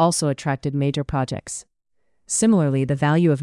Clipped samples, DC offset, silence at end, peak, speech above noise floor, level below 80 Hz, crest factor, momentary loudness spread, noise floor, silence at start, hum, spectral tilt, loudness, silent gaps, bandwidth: under 0.1%; under 0.1%; 0 s; -6 dBFS; 50 dB; -48 dBFS; 16 dB; 11 LU; -70 dBFS; 0 s; none; -5.5 dB/octave; -21 LUFS; none; 12 kHz